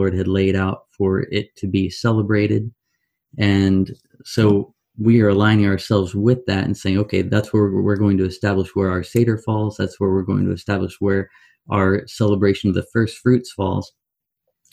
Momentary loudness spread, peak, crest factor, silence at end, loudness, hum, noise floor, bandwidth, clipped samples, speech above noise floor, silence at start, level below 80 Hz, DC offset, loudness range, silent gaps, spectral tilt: 7 LU; -2 dBFS; 16 dB; 0.85 s; -19 LUFS; none; -77 dBFS; 13.5 kHz; under 0.1%; 59 dB; 0 s; -50 dBFS; under 0.1%; 3 LU; none; -7.5 dB/octave